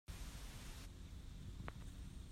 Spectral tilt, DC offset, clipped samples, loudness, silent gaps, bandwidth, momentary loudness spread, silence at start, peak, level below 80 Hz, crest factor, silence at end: -4.5 dB/octave; under 0.1%; under 0.1%; -54 LUFS; none; 16 kHz; 3 LU; 0.1 s; -32 dBFS; -54 dBFS; 20 dB; 0 s